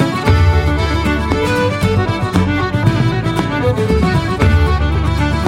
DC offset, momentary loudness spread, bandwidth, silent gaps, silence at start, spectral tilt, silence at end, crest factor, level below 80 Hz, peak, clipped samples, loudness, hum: under 0.1%; 3 LU; 14.5 kHz; none; 0 s; -7 dB/octave; 0 s; 12 dB; -20 dBFS; 0 dBFS; under 0.1%; -15 LUFS; none